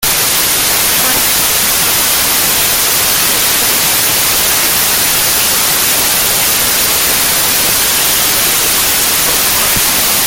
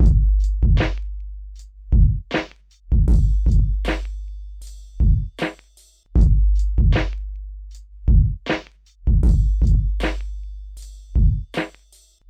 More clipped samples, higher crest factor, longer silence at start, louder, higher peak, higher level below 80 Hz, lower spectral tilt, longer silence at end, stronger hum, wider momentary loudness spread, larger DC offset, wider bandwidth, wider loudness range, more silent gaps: neither; about the same, 10 dB vs 14 dB; about the same, 0 s vs 0 s; first, -8 LUFS vs -21 LUFS; first, 0 dBFS vs -4 dBFS; second, -36 dBFS vs -20 dBFS; second, 0 dB/octave vs -7.5 dB/octave; second, 0 s vs 0.6 s; neither; second, 0 LU vs 19 LU; neither; first, over 20 kHz vs 7.4 kHz; about the same, 0 LU vs 1 LU; neither